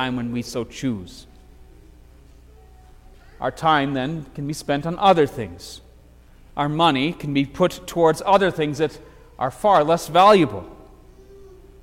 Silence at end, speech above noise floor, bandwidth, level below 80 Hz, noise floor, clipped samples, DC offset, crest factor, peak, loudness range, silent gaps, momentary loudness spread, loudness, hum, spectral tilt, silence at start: 0.4 s; 28 dB; 16.5 kHz; -48 dBFS; -48 dBFS; under 0.1%; under 0.1%; 18 dB; -4 dBFS; 9 LU; none; 16 LU; -20 LUFS; 60 Hz at -50 dBFS; -5.5 dB/octave; 0 s